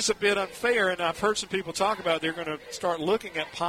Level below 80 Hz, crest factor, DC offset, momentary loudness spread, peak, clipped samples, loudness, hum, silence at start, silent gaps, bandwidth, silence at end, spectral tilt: -60 dBFS; 18 dB; under 0.1%; 7 LU; -10 dBFS; under 0.1%; -27 LUFS; none; 0 s; none; 16 kHz; 0 s; -2.5 dB/octave